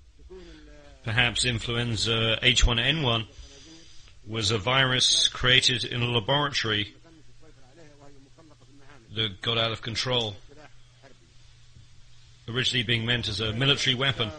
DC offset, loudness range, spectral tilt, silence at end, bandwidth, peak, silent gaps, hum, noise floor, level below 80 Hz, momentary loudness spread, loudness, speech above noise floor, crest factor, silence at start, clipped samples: under 0.1%; 8 LU; -3 dB/octave; 0 s; 10 kHz; -4 dBFS; none; none; -53 dBFS; -40 dBFS; 10 LU; -24 LUFS; 27 dB; 24 dB; 0.2 s; under 0.1%